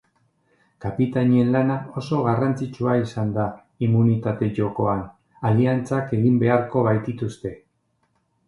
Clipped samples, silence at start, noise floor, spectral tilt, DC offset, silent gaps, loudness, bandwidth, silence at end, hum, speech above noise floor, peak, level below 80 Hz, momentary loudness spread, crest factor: under 0.1%; 0.8 s; -69 dBFS; -9 dB/octave; under 0.1%; none; -22 LUFS; 11 kHz; 0.9 s; none; 48 dB; -4 dBFS; -52 dBFS; 10 LU; 18 dB